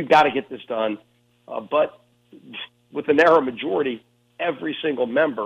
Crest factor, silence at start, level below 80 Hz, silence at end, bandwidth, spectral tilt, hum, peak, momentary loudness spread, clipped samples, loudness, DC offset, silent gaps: 18 dB; 0 s; -68 dBFS; 0 s; 9.6 kHz; -5.5 dB/octave; 60 Hz at -60 dBFS; -4 dBFS; 19 LU; under 0.1%; -22 LUFS; under 0.1%; none